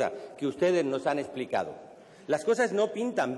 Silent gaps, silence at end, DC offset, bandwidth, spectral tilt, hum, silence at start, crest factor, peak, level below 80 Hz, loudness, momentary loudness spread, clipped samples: none; 0 s; under 0.1%; 12 kHz; -5 dB/octave; none; 0 s; 14 dB; -16 dBFS; -74 dBFS; -29 LUFS; 10 LU; under 0.1%